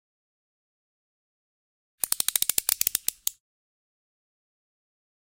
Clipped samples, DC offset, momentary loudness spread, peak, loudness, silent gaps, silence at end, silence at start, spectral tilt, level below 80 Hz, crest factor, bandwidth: under 0.1%; under 0.1%; 9 LU; -2 dBFS; -25 LUFS; none; 2.1 s; 2.05 s; 2 dB/octave; -68 dBFS; 30 dB; 17 kHz